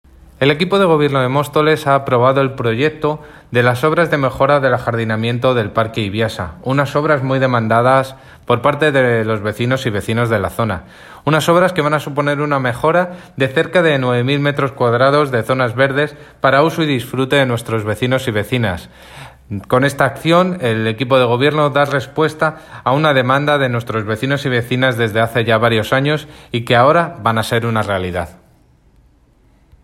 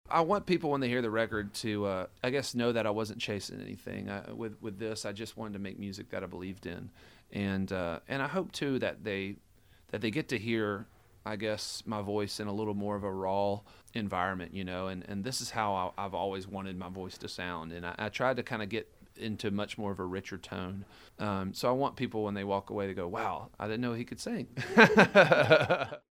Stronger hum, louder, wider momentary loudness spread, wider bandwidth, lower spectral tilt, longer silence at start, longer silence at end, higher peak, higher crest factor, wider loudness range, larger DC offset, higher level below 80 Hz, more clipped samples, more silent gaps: neither; first, -15 LUFS vs -32 LUFS; second, 7 LU vs 13 LU; about the same, 16 kHz vs 16.5 kHz; about the same, -6 dB/octave vs -5 dB/octave; first, 0.4 s vs 0.1 s; first, 1.55 s vs 0.15 s; first, 0 dBFS vs -4 dBFS; second, 14 dB vs 28 dB; second, 2 LU vs 8 LU; neither; first, -48 dBFS vs -62 dBFS; neither; neither